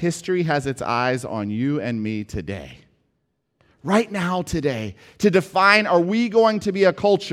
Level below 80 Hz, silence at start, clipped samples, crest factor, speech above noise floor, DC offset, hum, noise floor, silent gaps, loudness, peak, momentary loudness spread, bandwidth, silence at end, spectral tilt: -50 dBFS; 0 s; under 0.1%; 20 dB; 52 dB; under 0.1%; none; -72 dBFS; none; -20 LUFS; 0 dBFS; 14 LU; 15 kHz; 0 s; -5.5 dB/octave